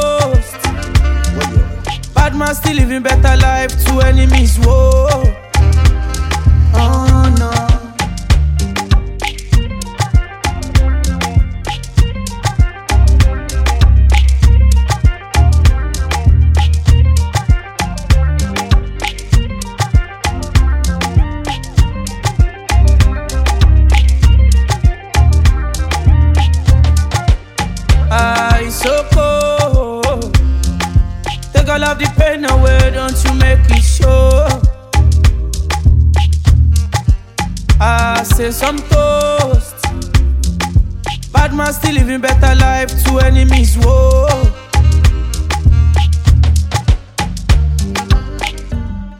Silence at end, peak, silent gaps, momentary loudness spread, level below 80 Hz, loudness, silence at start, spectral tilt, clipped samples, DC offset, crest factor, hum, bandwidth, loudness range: 0 s; 0 dBFS; none; 8 LU; -12 dBFS; -13 LUFS; 0 s; -5.5 dB/octave; under 0.1%; under 0.1%; 10 dB; none; 16 kHz; 4 LU